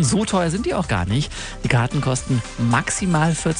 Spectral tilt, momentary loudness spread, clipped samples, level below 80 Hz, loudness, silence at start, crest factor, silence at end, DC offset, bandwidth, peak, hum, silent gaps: -5 dB/octave; 4 LU; under 0.1%; -36 dBFS; -21 LUFS; 0 s; 18 dB; 0 s; under 0.1%; 10 kHz; -2 dBFS; none; none